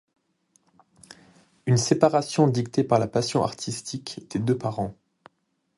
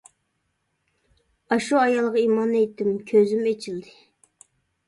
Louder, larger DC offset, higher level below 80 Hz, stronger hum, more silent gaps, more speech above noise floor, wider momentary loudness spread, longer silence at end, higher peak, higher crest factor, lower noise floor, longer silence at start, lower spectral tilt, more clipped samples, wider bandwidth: about the same, -24 LUFS vs -22 LUFS; neither; first, -60 dBFS vs -68 dBFS; neither; neither; second, 49 dB vs 53 dB; first, 13 LU vs 9 LU; second, 0.85 s vs 1.05 s; first, -4 dBFS vs -8 dBFS; first, 22 dB vs 16 dB; about the same, -73 dBFS vs -74 dBFS; first, 1.65 s vs 1.5 s; about the same, -5.5 dB/octave vs -5.5 dB/octave; neither; about the same, 11.5 kHz vs 11.5 kHz